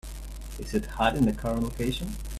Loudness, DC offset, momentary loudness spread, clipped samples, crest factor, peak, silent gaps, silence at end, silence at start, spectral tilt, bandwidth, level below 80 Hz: -28 LUFS; under 0.1%; 17 LU; under 0.1%; 22 dB; -8 dBFS; none; 0 s; 0.05 s; -5.5 dB/octave; 15 kHz; -38 dBFS